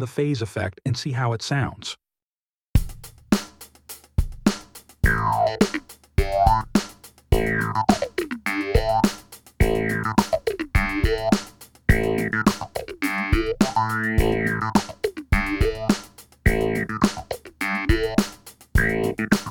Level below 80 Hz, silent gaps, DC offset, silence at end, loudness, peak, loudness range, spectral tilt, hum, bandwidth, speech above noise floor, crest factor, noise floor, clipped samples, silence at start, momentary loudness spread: -30 dBFS; 2.23-2.31 s, 2.38-2.73 s; under 0.1%; 0 s; -23 LUFS; -2 dBFS; 4 LU; -5.5 dB/octave; none; over 20 kHz; over 65 dB; 22 dB; under -90 dBFS; under 0.1%; 0 s; 9 LU